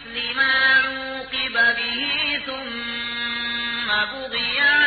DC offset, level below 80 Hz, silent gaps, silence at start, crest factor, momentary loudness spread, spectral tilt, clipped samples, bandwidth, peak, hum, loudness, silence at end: under 0.1%; -54 dBFS; none; 0 s; 16 dB; 10 LU; -6.5 dB/octave; under 0.1%; 4.8 kHz; -6 dBFS; none; -20 LUFS; 0 s